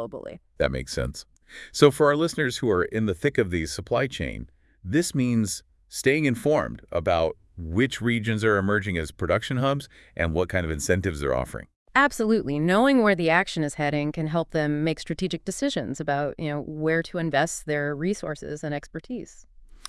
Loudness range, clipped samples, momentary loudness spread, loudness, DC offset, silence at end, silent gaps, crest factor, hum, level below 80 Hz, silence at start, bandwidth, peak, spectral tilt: 4 LU; under 0.1%; 13 LU; -25 LUFS; under 0.1%; 0.15 s; 11.76-11.86 s; 24 dB; none; -46 dBFS; 0 s; 12 kHz; 0 dBFS; -5.5 dB/octave